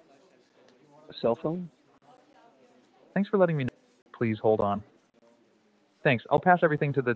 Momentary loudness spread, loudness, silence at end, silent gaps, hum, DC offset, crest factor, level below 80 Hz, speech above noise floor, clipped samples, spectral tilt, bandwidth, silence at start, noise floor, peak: 13 LU; -27 LUFS; 0 s; 4.02-4.06 s; none; under 0.1%; 22 dB; -64 dBFS; 40 dB; under 0.1%; -9 dB/octave; 7.6 kHz; 1.1 s; -66 dBFS; -8 dBFS